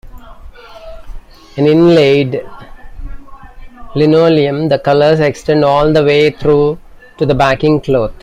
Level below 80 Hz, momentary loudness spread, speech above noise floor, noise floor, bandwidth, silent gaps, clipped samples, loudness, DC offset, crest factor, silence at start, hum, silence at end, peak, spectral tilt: -32 dBFS; 10 LU; 23 dB; -33 dBFS; 10 kHz; none; under 0.1%; -11 LUFS; under 0.1%; 12 dB; 0.05 s; none; 0.1 s; 0 dBFS; -7 dB/octave